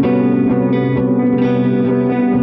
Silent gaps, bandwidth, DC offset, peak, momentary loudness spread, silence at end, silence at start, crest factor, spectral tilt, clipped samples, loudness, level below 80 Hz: none; 4.8 kHz; under 0.1%; -4 dBFS; 1 LU; 0 s; 0 s; 10 dB; -11 dB/octave; under 0.1%; -14 LUFS; -44 dBFS